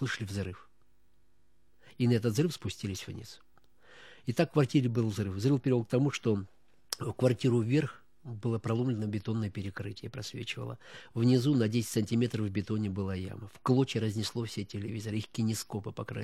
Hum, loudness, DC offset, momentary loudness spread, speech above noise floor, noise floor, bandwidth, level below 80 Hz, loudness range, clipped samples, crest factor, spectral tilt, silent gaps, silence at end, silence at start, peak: none; -32 LUFS; 0.1%; 13 LU; 41 dB; -72 dBFS; 14.5 kHz; -66 dBFS; 5 LU; under 0.1%; 22 dB; -6.5 dB/octave; none; 0 s; 0 s; -10 dBFS